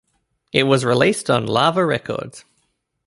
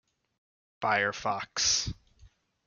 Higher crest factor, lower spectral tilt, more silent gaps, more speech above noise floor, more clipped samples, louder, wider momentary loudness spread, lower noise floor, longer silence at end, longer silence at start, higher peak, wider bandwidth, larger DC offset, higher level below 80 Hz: about the same, 18 dB vs 20 dB; first, -5 dB/octave vs -1 dB/octave; neither; first, 51 dB vs 31 dB; neither; first, -18 LUFS vs -28 LUFS; about the same, 12 LU vs 11 LU; first, -69 dBFS vs -60 dBFS; first, 0.65 s vs 0.4 s; second, 0.55 s vs 0.8 s; first, -2 dBFS vs -12 dBFS; about the same, 11.5 kHz vs 11.5 kHz; neither; about the same, -56 dBFS vs -54 dBFS